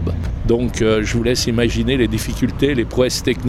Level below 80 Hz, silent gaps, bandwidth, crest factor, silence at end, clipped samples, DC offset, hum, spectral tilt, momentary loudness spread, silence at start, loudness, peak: -28 dBFS; none; 16 kHz; 14 dB; 0 s; under 0.1%; under 0.1%; none; -5.5 dB/octave; 4 LU; 0 s; -18 LUFS; -2 dBFS